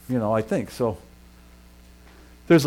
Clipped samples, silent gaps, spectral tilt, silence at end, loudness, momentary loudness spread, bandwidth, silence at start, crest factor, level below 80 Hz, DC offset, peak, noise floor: under 0.1%; none; -6.5 dB/octave; 0 s; -25 LUFS; 6 LU; 16.5 kHz; 0.1 s; 18 dB; -50 dBFS; under 0.1%; -6 dBFS; -49 dBFS